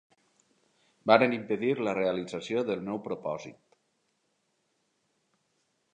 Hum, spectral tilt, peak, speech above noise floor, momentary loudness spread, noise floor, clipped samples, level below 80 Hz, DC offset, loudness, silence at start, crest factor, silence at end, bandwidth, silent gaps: none; -6 dB/octave; -6 dBFS; 47 dB; 14 LU; -76 dBFS; under 0.1%; -74 dBFS; under 0.1%; -29 LUFS; 1.05 s; 26 dB; 2.4 s; 10 kHz; none